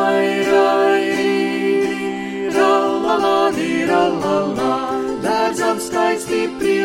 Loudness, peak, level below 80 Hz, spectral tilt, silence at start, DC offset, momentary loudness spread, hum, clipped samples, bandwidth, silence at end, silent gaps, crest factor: -17 LUFS; -2 dBFS; -54 dBFS; -4.5 dB/octave; 0 s; under 0.1%; 6 LU; none; under 0.1%; 16 kHz; 0 s; none; 14 dB